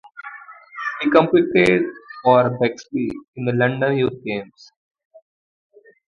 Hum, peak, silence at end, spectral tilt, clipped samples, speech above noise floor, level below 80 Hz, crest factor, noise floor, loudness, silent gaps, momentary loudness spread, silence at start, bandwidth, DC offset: none; 0 dBFS; 1.65 s; -7 dB/octave; under 0.1%; 22 dB; -56 dBFS; 20 dB; -40 dBFS; -19 LUFS; 3.28-3.33 s; 19 LU; 0.15 s; 11 kHz; under 0.1%